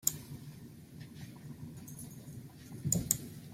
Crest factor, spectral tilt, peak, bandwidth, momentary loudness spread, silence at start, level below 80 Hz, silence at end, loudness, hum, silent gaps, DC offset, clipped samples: 32 dB; -3.5 dB/octave; -8 dBFS; 16.5 kHz; 18 LU; 0 s; -62 dBFS; 0 s; -39 LUFS; none; none; under 0.1%; under 0.1%